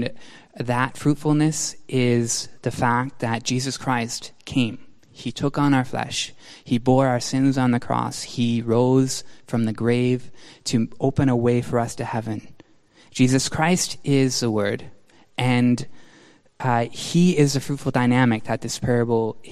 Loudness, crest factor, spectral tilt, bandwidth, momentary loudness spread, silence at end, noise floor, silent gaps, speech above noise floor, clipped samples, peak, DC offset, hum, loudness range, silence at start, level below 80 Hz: -22 LUFS; 18 dB; -5.5 dB/octave; 14.5 kHz; 9 LU; 0 s; -55 dBFS; none; 33 dB; under 0.1%; -4 dBFS; under 0.1%; none; 3 LU; 0 s; -52 dBFS